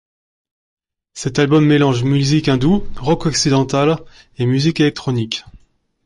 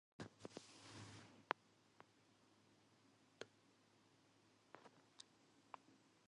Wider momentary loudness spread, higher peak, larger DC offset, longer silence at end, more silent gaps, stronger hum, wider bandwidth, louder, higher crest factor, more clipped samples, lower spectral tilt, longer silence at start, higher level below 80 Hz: second, 10 LU vs 16 LU; first, -2 dBFS vs -22 dBFS; neither; first, 0.5 s vs 0.05 s; neither; neither; about the same, 11.5 kHz vs 11 kHz; first, -16 LUFS vs -57 LUFS; second, 14 dB vs 40 dB; neither; first, -5.5 dB/octave vs -3.5 dB/octave; first, 1.15 s vs 0.2 s; first, -40 dBFS vs -88 dBFS